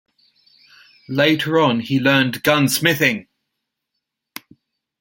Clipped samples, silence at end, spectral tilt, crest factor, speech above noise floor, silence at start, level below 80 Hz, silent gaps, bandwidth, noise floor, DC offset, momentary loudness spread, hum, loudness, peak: under 0.1%; 1.8 s; -4.5 dB/octave; 20 dB; 62 dB; 1.1 s; -60 dBFS; none; 17 kHz; -79 dBFS; under 0.1%; 22 LU; none; -17 LUFS; 0 dBFS